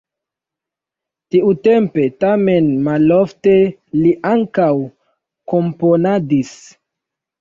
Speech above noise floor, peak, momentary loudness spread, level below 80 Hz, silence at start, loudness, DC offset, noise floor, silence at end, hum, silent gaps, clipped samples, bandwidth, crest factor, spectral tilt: 71 dB; -2 dBFS; 6 LU; -56 dBFS; 1.35 s; -15 LUFS; under 0.1%; -85 dBFS; 0.85 s; none; none; under 0.1%; 7.6 kHz; 12 dB; -8.5 dB/octave